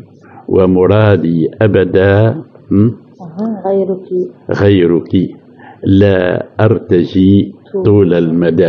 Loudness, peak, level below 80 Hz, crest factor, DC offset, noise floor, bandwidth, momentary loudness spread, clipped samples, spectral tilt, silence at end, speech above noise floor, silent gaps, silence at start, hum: -11 LUFS; 0 dBFS; -48 dBFS; 10 dB; under 0.1%; -31 dBFS; 6 kHz; 10 LU; under 0.1%; -10 dB/octave; 0 s; 21 dB; none; 0.5 s; none